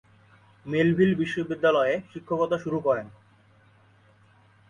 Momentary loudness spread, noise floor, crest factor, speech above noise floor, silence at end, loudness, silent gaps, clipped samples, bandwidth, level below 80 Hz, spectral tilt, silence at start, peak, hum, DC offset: 10 LU; -58 dBFS; 18 dB; 34 dB; 1.6 s; -25 LUFS; none; under 0.1%; 10 kHz; -62 dBFS; -7.5 dB/octave; 0.65 s; -10 dBFS; none; under 0.1%